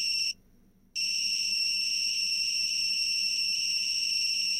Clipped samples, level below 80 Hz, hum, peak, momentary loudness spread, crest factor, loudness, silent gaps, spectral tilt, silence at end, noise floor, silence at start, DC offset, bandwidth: under 0.1%; -62 dBFS; none; -20 dBFS; 3 LU; 10 dB; -26 LUFS; none; 3.5 dB/octave; 0 s; -60 dBFS; 0 s; under 0.1%; 16 kHz